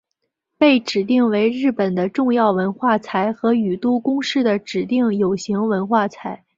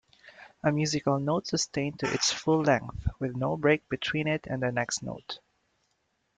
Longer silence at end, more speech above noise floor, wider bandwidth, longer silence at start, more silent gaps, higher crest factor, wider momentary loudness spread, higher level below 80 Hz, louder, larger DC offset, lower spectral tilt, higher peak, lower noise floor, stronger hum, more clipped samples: second, 0.2 s vs 1 s; first, 58 dB vs 47 dB; second, 7.8 kHz vs 9.4 kHz; first, 0.6 s vs 0.25 s; neither; about the same, 18 dB vs 20 dB; second, 5 LU vs 8 LU; second, -62 dBFS vs -50 dBFS; first, -19 LUFS vs -28 LUFS; neither; first, -6 dB/octave vs -4.5 dB/octave; first, -2 dBFS vs -10 dBFS; about the same, -76 dBFS vs -75 dBFS; neither; neither